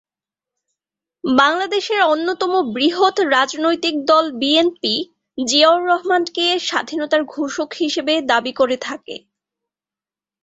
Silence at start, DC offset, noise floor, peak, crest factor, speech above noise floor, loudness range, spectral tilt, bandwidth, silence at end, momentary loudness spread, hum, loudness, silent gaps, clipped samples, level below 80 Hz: 1.25 s; under 0.1%; under -90 dBFS; -2 dBFS; 16 dB; over 73 dB; 4 LU; -2 dB/octave; 8.2 kHz; 1.25 s; 9 LU; none; -17 LUFS; none; under 0.1%; -64 dBFS